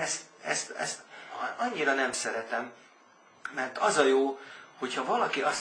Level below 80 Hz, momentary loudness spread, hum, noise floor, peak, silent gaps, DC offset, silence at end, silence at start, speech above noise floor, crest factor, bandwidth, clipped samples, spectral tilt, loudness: -78 dBFS; 16 LU; none; -59 dBFS; -8 dBFS; none; under 0.1%; 0 s; 0 s; 30 dB; 24 dB; 11 kHz; under 0.1%; -2 dB/octave; -30 LUFS